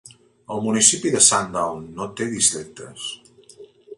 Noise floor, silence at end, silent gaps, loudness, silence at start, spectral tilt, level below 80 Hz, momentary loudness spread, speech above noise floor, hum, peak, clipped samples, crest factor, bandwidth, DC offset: -47 dBFS; 0.05 s; none; -18 LUFS; 0.5 s; -2 dB/octave; -60 dBFS; 18 LU; 26 dB; none; 0 dBFS; under 0.1%; 22 dB; 11.5 kHz; under 0.1%